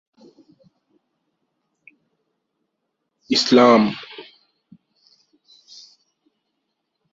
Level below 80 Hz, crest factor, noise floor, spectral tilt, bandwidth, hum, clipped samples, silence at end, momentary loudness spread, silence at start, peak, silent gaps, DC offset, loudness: -68 dBFS; 22 dB; -77 dBFS; -4.5 dB/octave; 7.8 kHz; none; under 0.1%; 2.9 s; 25 LU; 3.3 s; -2 dBFS; none; under 0.1%; -15 LUFS